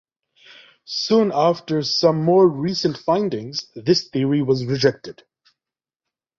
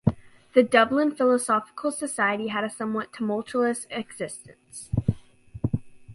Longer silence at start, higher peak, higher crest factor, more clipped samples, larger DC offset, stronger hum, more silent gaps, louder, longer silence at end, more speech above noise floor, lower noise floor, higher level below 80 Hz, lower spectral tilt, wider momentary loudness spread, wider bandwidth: first, 0.9 s vs 0.05 s; about the same, -2 dBFS vs -4 dBFS; about the same, 18 dB vs 22 dB; neither; neither; neither; neither; first, -19 LUFS vs -25 LUFS; first, 1.25 s vs 0 s; first, 70 dB vs 20 dB; first, -89 dBFS vs -45 dBFS; second, -60 dBFS vs -48 dBFS; about the same, -6 dB/octave vs -5.5 dB/octave; second, 11 LU vs 15 LU; second, 7.6 kHz vs 11.5 kHz